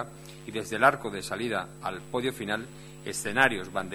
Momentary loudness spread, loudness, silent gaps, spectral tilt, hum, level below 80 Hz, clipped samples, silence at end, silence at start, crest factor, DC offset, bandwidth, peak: 15 LU; -29 LUFS; none; -3.5 dB/octave; none; -58 dBFS; under 0.1%; 0 s; 0 s; 24 dB; under 0.1%; over 20 kHz; -6 dBFS